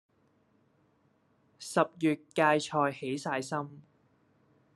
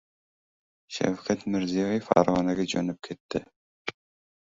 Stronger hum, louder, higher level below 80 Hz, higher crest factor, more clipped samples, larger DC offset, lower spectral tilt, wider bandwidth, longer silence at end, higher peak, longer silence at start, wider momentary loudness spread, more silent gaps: neither; second, -30 LUFS vs -27 LUFS; second, -80 dBFS vs -60 dBFS; about the same, 24 dB vs 26 dB; neither; neither; about the same, -5 dB/octave vs -5.5 dB/octave; first, 12.5 kHz vs 7.8 kHz; first, 0.95 s vs 0.5 s; second, -10 dBFS vs -4 dBFS; first, 1.6 s vs 0.9 s; second, 11 LU vs 15 LU; second, none vs 3.20-3.29 s, 3.56-3.85 s